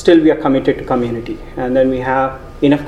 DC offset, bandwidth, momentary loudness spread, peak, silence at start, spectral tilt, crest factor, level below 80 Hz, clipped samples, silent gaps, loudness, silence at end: under 0.1%; 9.2 kHz; 11 LU; 0 dBFS; 0 s; -7.5 dB/octave; 14 dB; -36 dBFS; under 0.1%; none; -15 LUFS; 0 s